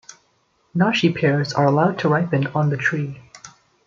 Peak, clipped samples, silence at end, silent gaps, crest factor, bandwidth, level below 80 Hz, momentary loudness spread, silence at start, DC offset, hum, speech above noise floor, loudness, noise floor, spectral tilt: -2 dBFS; under 0.1%; 0.4 s; none; 18 dB; 7.6 kHz; -60 dBFS; 10 LU; 0.1 s; under 0.1%; none; 45 dB; -19 LUFS; -64 dBFS; -6.5 dB/octave